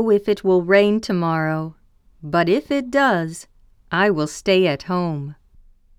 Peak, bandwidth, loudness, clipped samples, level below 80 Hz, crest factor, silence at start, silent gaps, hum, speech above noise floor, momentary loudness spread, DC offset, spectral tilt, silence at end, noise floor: -2 dBFS; 13.5 kHz; -19 LUFS; under 0.1%; -52 dBFS; 18 dB; 0 s; none; none; 32 dB; 15 LU; under 0.1%; -6 dB/octave; 0.65 s; -50 dBFS